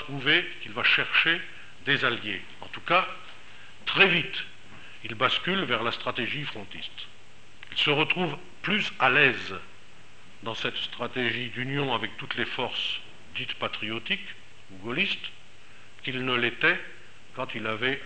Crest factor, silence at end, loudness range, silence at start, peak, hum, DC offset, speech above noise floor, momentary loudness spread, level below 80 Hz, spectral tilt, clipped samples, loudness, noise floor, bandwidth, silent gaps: 24 dB; 0 s; 5 LU; 0 s; -4 dBFS; none; 1%; 27 dB; 19 LU; -66 dBFS; -4.5 dB/octave; under 0.1%; -26 LUFS; -54 dBFS; 8.8 kHz; none